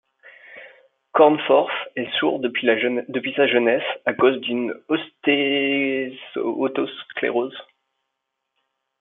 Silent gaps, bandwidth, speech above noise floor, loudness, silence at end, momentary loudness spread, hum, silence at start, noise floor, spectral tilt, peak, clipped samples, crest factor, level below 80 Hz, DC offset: none; 4 kHz; 58 dB; -21 LUFS; 1.35 s; 10 LU; none; 0.25 s; -79 dBFS; -8.5 dB/octave; -2 dBFS; under 0.1%; 20 dB; -74 dBFS; under 0.1%